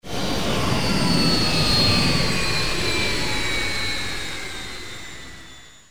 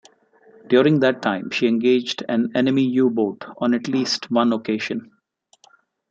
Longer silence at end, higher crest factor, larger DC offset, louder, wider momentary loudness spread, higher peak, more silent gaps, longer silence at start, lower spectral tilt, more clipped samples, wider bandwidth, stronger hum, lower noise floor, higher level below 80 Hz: second, 0 s vs 1.05 s; about the same, 16 dB vs 18 dB; first, 5% vs under 0.1%; about the same, -21 LUFS vs -20 LUFS; first, 17 LU vs 7 LU; about the same, -6 dBFS vs -4 dBFS; neither; second, 0 s vs 0.7 s; second, -3.5 dB/octave vs -5.5 dB/octave; neither; first, over 20 kHz vs 7.6 kHz; neither; second, -44 dBFS vs -62 dBFS; first, -36 dBFS vs -68 dBFS